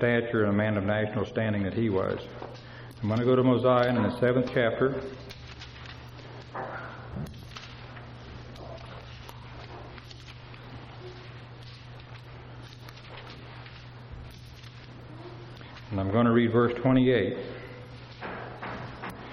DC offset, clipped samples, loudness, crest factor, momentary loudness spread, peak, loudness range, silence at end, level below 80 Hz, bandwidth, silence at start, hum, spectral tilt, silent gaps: under 0.1%; under 0.1%; -27 LUFS; 20 dB; 22 LU; -10 dBFS; 18 LU; 0 s; -54 dBFS; 11.5 kHz; 0 s; none; -8 dB/octave; none